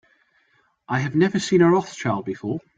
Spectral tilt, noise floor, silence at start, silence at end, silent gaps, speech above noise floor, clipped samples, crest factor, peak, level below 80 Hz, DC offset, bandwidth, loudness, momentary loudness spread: -6.5 dB/octave; -64 dBFS; 0.9 s; 0.2 s; none; 43 dB; under 0.1%; 18 dB; -6 dBFS; -62 dBFS; under 0.1%; 9.2 kHz; -21 LUFS; 11 LU